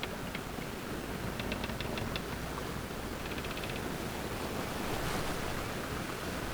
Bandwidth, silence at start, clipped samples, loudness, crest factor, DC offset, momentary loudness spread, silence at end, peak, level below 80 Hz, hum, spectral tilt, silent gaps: over 20 kHz; 0 s; under 0.1%; -38 LUFS; 18 dB; under 0.1%; 4 LU; 0 s; -20 dBFS; -48 dBFS; none; -4.5 dB/octave; none